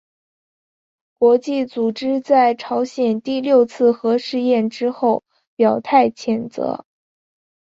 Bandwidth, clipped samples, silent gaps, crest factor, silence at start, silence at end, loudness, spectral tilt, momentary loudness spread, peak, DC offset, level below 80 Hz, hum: 7.8 kHz; under 0.1%; 5.47-5.57 s; 18 dB; 1.2 s; 0.95 s; -18 LUFS; -6 dB/octave; 8 LU; -2 dBFS; under 0.1%; -66 dBFS; none